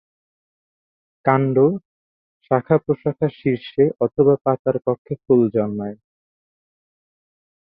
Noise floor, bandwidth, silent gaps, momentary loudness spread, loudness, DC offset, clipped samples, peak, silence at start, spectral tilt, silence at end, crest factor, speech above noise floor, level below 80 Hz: under -90 dBFS; 4.9 kHz; 1.85-2.40 s, 4.41-4.45 s, 4.59-4.65 s, 4.98-5.05 s; 8 LU; -19 LUFS; under 0.1%; under 0.1%; -2 dBFS; 1.25 s; -12 dB/octave; 1.8 s; 20 dB; over 72 dB; -60 dBFS